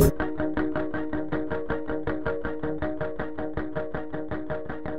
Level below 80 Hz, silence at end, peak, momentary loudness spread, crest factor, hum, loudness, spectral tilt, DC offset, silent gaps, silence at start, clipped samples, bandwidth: -40 dBFS; 0 s; -6 dBFS; 5 LU; 22 dB; none; -31 LUFS; -7 dB/octave; 2%; none; 0 s; under 0.1%; 13 kHz